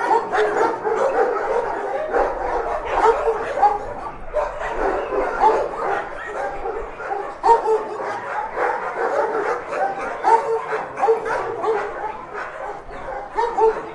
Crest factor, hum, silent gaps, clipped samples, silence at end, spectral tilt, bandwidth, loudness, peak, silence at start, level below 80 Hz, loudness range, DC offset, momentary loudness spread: 18 dB; none; none; under 0.1%; 0 s; -4.5 dB/octave; 11 kHz; -21 LUFS; -2 dBFS; 0 s; -42 dBFS; 3 LU; under 0.1%; 11 LU